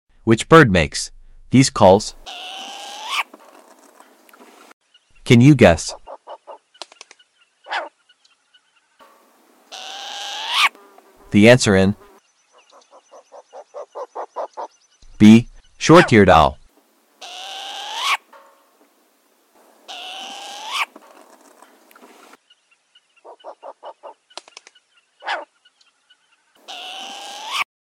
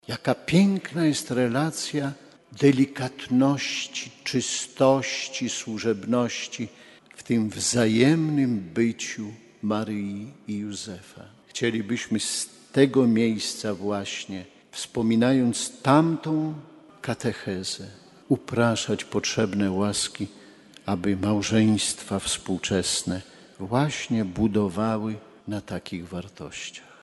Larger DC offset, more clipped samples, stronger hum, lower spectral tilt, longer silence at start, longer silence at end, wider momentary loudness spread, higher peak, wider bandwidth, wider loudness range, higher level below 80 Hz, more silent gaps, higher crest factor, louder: neither; neither; neither; about the same, -5.5 dB/octave vs -4.5 dB/octave; first, 0.25 s vs 0.1 s; about the same, 0.2 s vs 0.2 s; first, 27 LU vs 15 LU; first, 0 dBFS vs -4 dBFS; first, 15.5 kHz vs 11.5 kHz; first, 20 LU vs 4 LU; first, -44 dBFS vs -58 dBFS; first, 4.73-4.81 s vs none; about the same, 20 dB vs 22 dB; first, -15 LUFS vs -25 LUFS